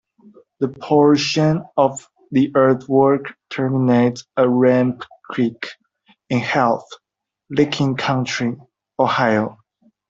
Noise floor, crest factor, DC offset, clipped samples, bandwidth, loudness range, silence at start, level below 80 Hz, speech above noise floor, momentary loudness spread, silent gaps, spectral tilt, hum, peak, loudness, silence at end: -59 dBFS; 16 dB; under 0.1%; under 0.1%; 7.8 kHz; 4 LU; 0.6 s; -60 dBFS; 42 dB; 12 LU; none; -6 dB/octave; none; -2 dBFS; -18 LUFS; 0.55 s